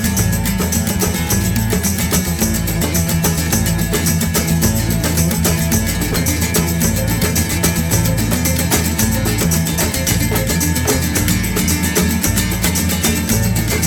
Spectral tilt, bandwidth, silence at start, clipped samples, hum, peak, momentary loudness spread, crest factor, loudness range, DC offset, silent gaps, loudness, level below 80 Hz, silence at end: -4 dB/octave; over 20 kHz; 0 s; under 0.1%; none; 0 dBFS; 2 LU; 14 dB; 1 LU; under 0.1%; none; -16 LUFS; -26 dBFS; 0 s